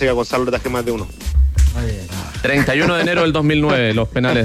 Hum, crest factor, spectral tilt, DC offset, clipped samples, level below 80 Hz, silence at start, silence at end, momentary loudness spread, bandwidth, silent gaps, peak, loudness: none; 12 dB; -6 dB/octave; under 0.1%; under 0.1%; -24 dBFS; 0 s; 0 s; 9 LU; 15 kHz; none; -4 dBFS; -17 LUFS